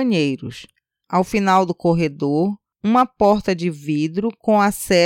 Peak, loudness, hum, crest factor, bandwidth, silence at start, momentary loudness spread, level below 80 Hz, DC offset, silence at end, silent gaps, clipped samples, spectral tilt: -4 dBFS; -19 LUFS; none; 14 dB; 17 kHz; 0 s; 7 LU; -50 dBFS; under 0.1%; 0 s; none; under 0.1%; -6 dB/octave